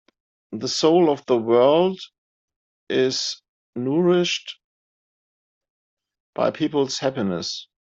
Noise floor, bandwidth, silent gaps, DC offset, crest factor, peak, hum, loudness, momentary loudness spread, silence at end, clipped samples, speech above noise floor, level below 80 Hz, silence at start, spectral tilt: under -90 dBFS; 8 kHz; 2.18-2.48 s, 2.56-2.87 s, 3.48-3.73 s, 4.64-5.61 s, 5.70-5.97 s, 6.20-6.33 s; under 0.1%; 18 dB; -6 dBFS; none; -21 LUFS; 20 LU; 0.2 s; under 0.1%; over 70 dB; -68 dBFS; 0.5 s; -5 dB/octave